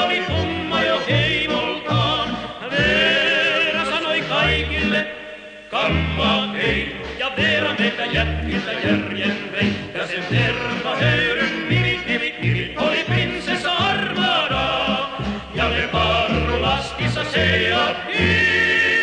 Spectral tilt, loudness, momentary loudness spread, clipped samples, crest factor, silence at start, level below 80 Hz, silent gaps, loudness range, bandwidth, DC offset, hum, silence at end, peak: -5 dB/octave; -19 LUFS; 7 LU; under 0.1%; 16 dB; 0 s; -36 dBFS; none; 3 LU; 10 kHz; under 0.1%; none; 0 s; -4 dBFS